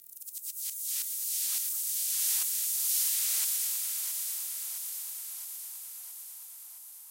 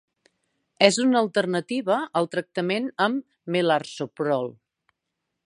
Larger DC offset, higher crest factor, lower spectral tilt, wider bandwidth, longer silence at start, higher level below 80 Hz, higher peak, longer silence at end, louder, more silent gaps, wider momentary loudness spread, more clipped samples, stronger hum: neither; second, 18 dB vs 24 dB; second, 7.5 dB/octave vs -4.5 dB/octave; first, 16 kHz vs 11.5 kHz; second, 0 s vs 0.8 s; second, under -90 dBFS vs -78 dBFS; second, -16 dBFS vs 0 dBFS; second, 0 s vs 0.95 s; second, -29 LUFS vs -24 LUFS; neither; first, 16 LU vs 8 LU; neither; neither